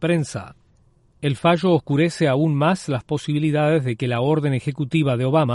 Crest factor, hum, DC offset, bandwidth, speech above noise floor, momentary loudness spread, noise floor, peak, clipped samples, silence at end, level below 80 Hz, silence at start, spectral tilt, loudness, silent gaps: 16 dB; none; under 0.1%; 11.5 kHz; 37 dB; 6 LU; -57 dBFS; -4 dBFS; under 0.1%; 0 s; -56 dBFS; 0 s; -7 dB/octave; -20 LUFS; none